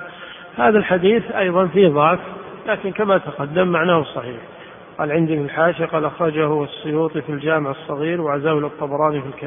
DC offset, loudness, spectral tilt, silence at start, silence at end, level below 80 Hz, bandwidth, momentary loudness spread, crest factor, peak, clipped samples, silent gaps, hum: under 0.1%; -19 LUFS; -11.5 dB/octave; 0 s; 0 s; -56 dBFS; 3.7 kHz; 15 LU; 18 dB; -2 dBFS; under 0.1%; none; none